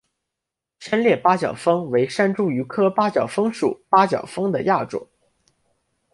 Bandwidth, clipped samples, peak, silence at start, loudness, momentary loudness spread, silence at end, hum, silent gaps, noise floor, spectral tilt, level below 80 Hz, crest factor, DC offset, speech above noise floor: 11.5 kHz; under 0.1%; -2 dBFS; 0.8 s; -20 LUFS; 7 LU; 1.1 s; none; none; -85 dBFS; -6.5 dB/octave; -64 dBFS; 20 dB; under 0.1%; 65 dB